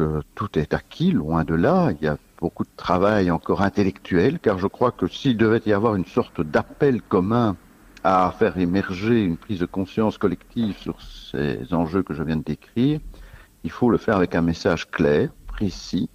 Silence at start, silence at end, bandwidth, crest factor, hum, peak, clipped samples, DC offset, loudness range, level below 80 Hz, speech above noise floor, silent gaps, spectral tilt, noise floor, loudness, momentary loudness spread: 0 s; 0.1 s; 15 kHz; 18 dB; none; -4 dBFS; under 0.1%; under 0.1%; 4 LU; -44 dBFS; 23 dB; none; -7.5 dB/octave; -44 dBFS; -22 LUFS; 9 LU